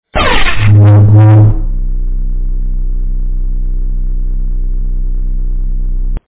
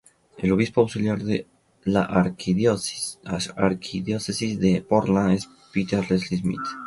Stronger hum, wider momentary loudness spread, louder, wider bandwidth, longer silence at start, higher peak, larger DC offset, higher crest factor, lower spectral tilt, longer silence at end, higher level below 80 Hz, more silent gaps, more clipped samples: neither; first, 15 LU vs 8 LU; first, -12 LUFS vs -24 LUFS; second, 4 kHz vs 11.5 kHz; second, 0.05 s vs 0.35 s; first, 0 dBFS vs -4 dBFS; neither; second, 8 dB vs 18 dB; first, -10.5 dB/octave vs -6 dB/octave; about the same, 0.05 s vs 0 s; first, -14 dBFS vs -50 dBFS; neither; neither